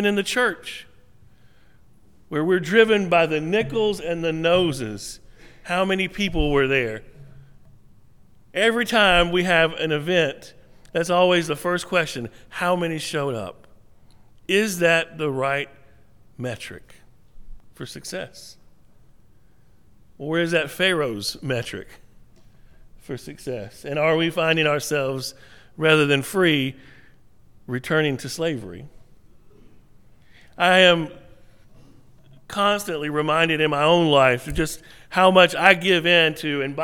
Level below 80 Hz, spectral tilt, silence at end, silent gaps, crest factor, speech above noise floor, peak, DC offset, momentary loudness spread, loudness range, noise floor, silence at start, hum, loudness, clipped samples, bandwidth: -44 dBFS; -4.5 dB/octave; 0 s; none; 22 dB; 36 dB; 0 dBFS; 0.3%; 18 LU; 9 LU; -57 dBFS; 0 s; none; -20 LUFS; under 0.1%; 18.5 kHz